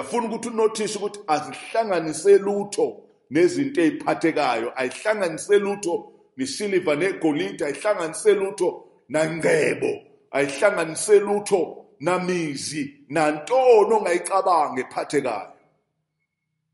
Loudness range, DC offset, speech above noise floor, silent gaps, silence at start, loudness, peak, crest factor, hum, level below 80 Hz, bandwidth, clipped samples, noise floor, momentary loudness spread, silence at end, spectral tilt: 3 LU; under 0.1%; 56 dB; none; 0 s; -22 LUFS; -4 dBFS; 18 dB; none; -70 dBFS; 11.5 kHz; under 0.1%; -78 dBFS; 10 LU; 1.25 s; -4.5 dB/octave